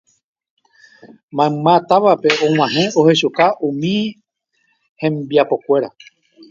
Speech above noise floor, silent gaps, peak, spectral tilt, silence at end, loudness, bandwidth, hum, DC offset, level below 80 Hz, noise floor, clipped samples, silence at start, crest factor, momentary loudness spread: 50 dB; 1.23-1.28 s, 4.89-4.96 s; 0 dBFS; -5.5 dB/octave; 0.6 s; -15 LUFS; 7.6 kHz; none; under 0.1%; -62 dBFS; -65 dBFS; under 0.1%; 1.05 s; 16 dB; 9 LU